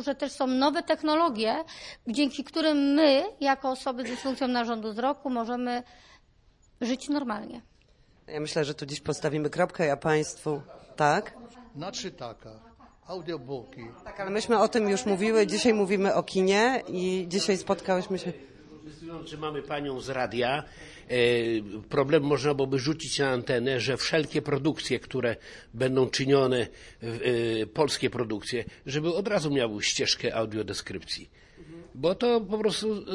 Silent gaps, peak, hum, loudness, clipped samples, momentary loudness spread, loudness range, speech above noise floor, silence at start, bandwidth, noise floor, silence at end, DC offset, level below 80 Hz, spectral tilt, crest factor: none; -8 dBFS; none; -27 LUFS; under 0.1%; 15 LU; 7 LU; 34 dB; 0 s; 11.5 kHz; -61 dBFS; 0 s; under 0.1%; -58 dBFS; -4.5 dB/octave; 20 dB